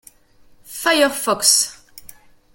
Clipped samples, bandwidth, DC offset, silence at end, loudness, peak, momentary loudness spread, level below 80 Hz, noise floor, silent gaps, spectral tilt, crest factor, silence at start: under 0.1%; 17 kHz; under 0.1%; 0.45 s; -16 LUFS; 0 dBFS; 10 LU; -58 dBFS; -50 dBFS; none; 0 dB/octave; 22 dB; 0.7 s